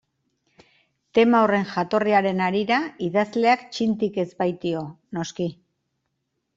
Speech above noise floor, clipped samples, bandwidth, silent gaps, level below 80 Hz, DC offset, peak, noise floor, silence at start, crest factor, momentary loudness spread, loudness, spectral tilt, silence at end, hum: 55 dB; under 0.1%; 7.8 kHz; none; -66 dBFS; under 0.1%; -6 dBFS; -77 dBFS; 1.15 s; 18 dB; 12 LU; -23 LUFS; -6 dB/octave; 1.05 s; none